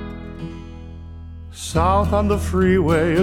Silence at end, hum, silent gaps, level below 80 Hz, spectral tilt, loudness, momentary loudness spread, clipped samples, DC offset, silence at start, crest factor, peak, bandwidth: 0 s; none; none; -30 dBFS; -6.5 dB/octave; -18 LUFS; 20 LU; under 0.1%; under 0.1%; 0 s; 16 dB; -4 dBFS; 14.5 kHz